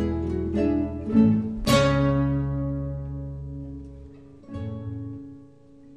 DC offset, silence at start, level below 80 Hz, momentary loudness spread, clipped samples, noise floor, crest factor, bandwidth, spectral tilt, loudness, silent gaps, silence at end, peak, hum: 0.2%; 0 s; -38 dBFS; 20 LU; under 0.1%; -50 dBFS; 18 dB; 11 kHz; -7 dB/octave; -25 LUFS; none; 0 s; -8 dBFS; none